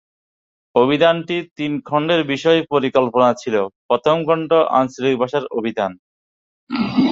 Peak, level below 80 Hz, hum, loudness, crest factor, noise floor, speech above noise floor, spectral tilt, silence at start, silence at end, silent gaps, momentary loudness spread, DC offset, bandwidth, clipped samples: -2 dBFS; -60 dBFS; none; -18 LUFS; 16 dB; under -90 dBFS; over 73 dB; -6 dB/octave; 0.75 s; 0 s; 1.51-1.56 s, 3.76-3.89 s, 5.99-6.67 s; 9 LU; under 0.1%; 7.6 kHz; under 0.1%